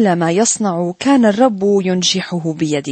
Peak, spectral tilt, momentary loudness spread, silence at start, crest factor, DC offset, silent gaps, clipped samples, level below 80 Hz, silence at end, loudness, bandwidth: -2 dBFS; -4.5 dB/octave; 6 LU; 0 s; 12 dB; under 0.1%; none; under 0.1%; -58 dBFS; 0 s; -15 LUFS; 8.8 kHz